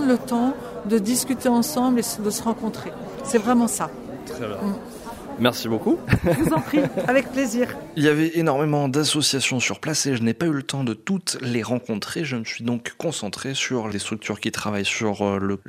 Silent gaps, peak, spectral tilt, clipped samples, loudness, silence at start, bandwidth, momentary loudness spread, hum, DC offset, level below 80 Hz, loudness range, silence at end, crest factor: none; -4 dBFS; -4.5 dB/octave; under 0.1%; -23 LUFS; 0 s; 16 kHz; 8 LU; none; under 0.1%; -48 dBFS; 5 LU; 0.1 s; 20 dB